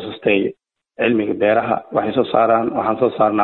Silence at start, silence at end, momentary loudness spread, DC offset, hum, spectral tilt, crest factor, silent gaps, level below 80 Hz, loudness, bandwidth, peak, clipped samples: 0 s; 0 s; 4 LU; under 0.1%; none; -10 dB/octave; 14 dB; none; -58 dBFS; -18 LUFS; 4.2 kHz; -2 dBFS; under 0.1%